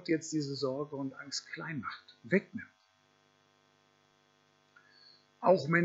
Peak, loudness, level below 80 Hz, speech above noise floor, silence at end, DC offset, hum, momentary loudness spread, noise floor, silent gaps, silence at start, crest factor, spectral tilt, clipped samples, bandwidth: -12 dBFS; -34 LUFS; -84 dBFS; 37 dB; 0 s; under 0.1%; none; 18 LU; -70 dBFS; none; 0 s; 24 dB; -5.5 dB/octave; under 0.1%; 8 kHz